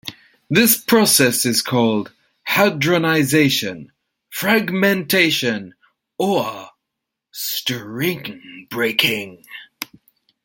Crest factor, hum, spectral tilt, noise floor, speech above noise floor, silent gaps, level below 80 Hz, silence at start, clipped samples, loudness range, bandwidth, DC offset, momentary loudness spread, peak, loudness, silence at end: 20 dB; none; -3.5 dB/octave; -81 dBFS; 63 dB; none; -60 dBFS; 0.05 s; under 0.1%; 7 LU; 17 kHz; under 0.1%; 19 LU; 0 dBFS; -17 LUFS; 0.6 s